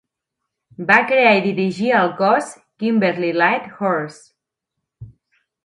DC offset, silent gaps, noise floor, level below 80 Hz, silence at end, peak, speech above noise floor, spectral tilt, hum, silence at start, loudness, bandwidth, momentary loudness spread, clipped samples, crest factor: under 0.1%; none; -80 dBFS; -62 dBFS; 0.55 s; 0 dBFS; 63 dB; -6 dB/octave; none; 0.8 s; -17 LUFS; 11.5 kHz; 11 LU; under 0.1%; 20 dB